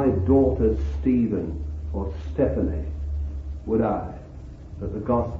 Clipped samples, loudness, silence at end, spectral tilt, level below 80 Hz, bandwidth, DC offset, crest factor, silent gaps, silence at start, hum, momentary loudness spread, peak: under 0.1%; -25 LUFS; 0 s; -11 dB/octave; -32 dBFS; 6.2 kHz; under 0.1%; 16 dB; none; 0 s; none; 16 LU; -8 dBFS